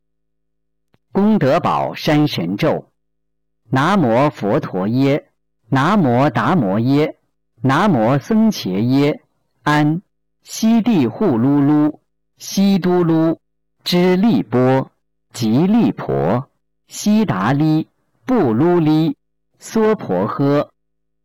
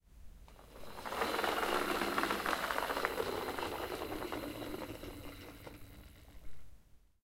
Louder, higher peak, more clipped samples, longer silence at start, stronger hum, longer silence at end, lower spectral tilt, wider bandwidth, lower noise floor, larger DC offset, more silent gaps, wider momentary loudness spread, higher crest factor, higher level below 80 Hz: first, -16 LUFS vs -37 LUFS; first, -8 dBFS vs -14 dBFS; neither; first, 1.15 s vs 0.1 s; neither; first, 0.6 s vs 0.1 s; first, -7 dB/octave vs -3.5 dB/octave; about the same, 17 kHz vs 16 kHz; first, -76 dBFS vs -59 dBFS; neither; neither; second, 9 LU vs 22 LU; second, 8 dB vs 26 dB; first, -52 dBFS vs -58 dBFS